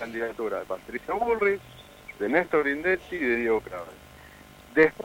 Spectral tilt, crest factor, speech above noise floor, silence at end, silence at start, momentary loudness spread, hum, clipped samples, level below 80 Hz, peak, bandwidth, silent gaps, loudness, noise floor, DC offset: -6 dB/octave; 20 dB; 23 dB; 0 s; 0 s; 16 LU; none; under 0.1%; -56 dBFS; -6 dBFS; 16.5 kHz; none; -27 LUFS; -49 dBFS; under 0.1%